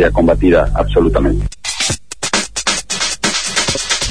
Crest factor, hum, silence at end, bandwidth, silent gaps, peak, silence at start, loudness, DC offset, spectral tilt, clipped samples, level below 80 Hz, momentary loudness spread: 14 dB; none; 0 s; 11 kHz; none; 0 dBFS; 0 s; -15 LUFS; 2%; -3.5 dB/octave; under 0.1%; -22 dBFS; 5 LU